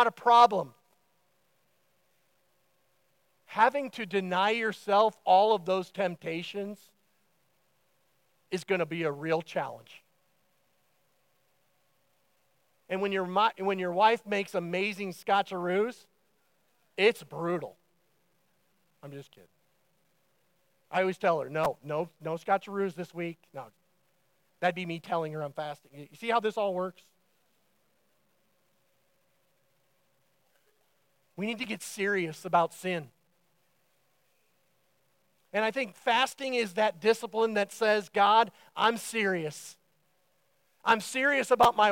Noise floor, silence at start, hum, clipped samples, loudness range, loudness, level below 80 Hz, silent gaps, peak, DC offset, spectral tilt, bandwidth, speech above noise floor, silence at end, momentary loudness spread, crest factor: -73 dBFS; 0 s; none; under 0.1%; 10 LU; -29 LUFS; -74 dBFS; none; -8 dBFS; under 0.1%; -4.5 dB/octave; 16.5 kHz; 44 dB; 0 s; 15 LU; 24 dB